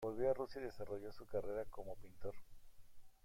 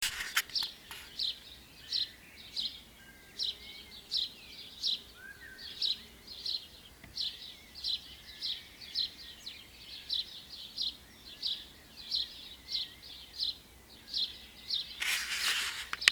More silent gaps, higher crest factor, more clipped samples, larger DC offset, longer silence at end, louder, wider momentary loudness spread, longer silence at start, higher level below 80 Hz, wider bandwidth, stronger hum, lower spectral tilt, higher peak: neither; second, 18 dB vs 38 dB; neither; neither; about the same, 0.1 s vs 0 s; second, -46 LUFS vs -35 LUFS; second, 13 LU vs 17 LU; about the same, 0 s vs 0 s; about the same, -62 dBFS vs -64 dBFS; second, 16.5 kHz vs over 20 kHz; neither; first, -7 dB/octave vs 1 dB/octave; second, -26 dBFS vs 0 dBFS